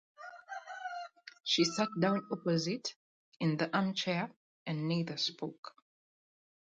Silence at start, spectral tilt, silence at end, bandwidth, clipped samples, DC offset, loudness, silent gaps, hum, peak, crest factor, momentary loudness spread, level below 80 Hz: 0.2 s; -5 dB/octave; 1 s; 9 kHz; under 0.1%; under 0.1%; -34 LUFS; 1.40-1.44 s, 2.96-3.40 s, 4.36-4.66 s, 5.58-5.63 s; none; -18 dBFS; 18 dB; 16 LU; -80 dBFS